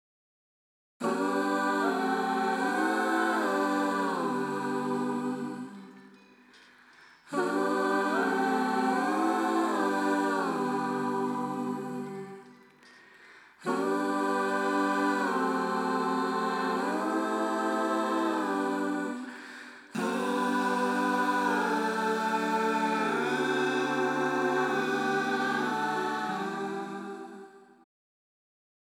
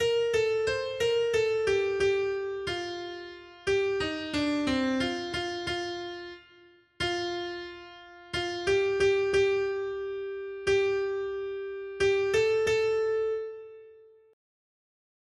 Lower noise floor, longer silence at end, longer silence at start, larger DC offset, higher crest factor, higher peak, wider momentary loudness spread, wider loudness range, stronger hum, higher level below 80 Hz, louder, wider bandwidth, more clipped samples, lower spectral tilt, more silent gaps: about the same, -57 dBFS vs -58 dBFS; about the same, 1.25 s vs 1.35 s; first, 1 s vs 0 s; neither; about the same, 16 dB vs 14 dB; about the same, -14 dBFS vs -14 dBFS; second, 9 LU vs 14 LU; about the same, 6 LU vs 4 LU; neither; second, -88 dBFS vs -56 dBFS; about the same, -29 LUFS vs -29 LUFS; first, 17 kHz vs 11.5 kHz; neither; about the same, -5 dB/octave vs -4 dB/octave; neither